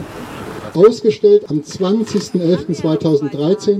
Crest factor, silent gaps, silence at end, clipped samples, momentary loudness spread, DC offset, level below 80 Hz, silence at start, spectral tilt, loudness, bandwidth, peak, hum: 14 dB; none; 0 s; under 0.1%; 15 LU; under 0.1%; -52 dBFS; 0 s; -7 dB/octave; -15 LUFS; 11 kHz; 0 dBFS; none